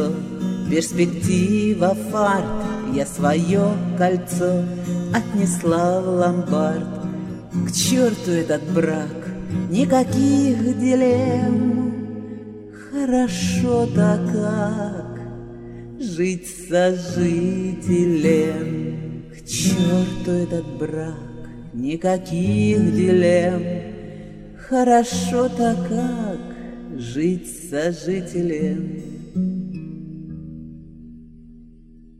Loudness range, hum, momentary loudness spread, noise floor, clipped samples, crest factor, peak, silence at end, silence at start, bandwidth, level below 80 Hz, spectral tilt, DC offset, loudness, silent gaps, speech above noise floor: 6 LU; none; 17 LU; -45 dBFS; under 0.1%; 16 dB; -4 dBFS; 0.15 s; 0 s; 15 kHz; -46 dBFS; -6 dB/octave; under 0.1%; -21 LUFS; none; 26 dB